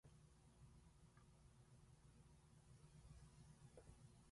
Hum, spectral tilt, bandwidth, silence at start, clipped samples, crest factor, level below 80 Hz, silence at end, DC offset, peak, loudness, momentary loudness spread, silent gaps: none; -5.5 dB/octave; 11.5 kHz; 0.05 s; under 0.1%; 16 dB; -74 dBFS; 0 s; under 0.1%; -50 dBFS; -68 LUFS; 3 LU; none